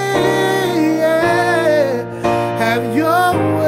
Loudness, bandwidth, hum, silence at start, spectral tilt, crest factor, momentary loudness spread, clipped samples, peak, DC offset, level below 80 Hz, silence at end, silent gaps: -15 LUFS; 16 kHz; none; 0 s; -5.5 dB/octave; 12 dB; 4 LU; under 0.1%; -2 dBFS; under 0.1%; -50 dBFS; 0 s; none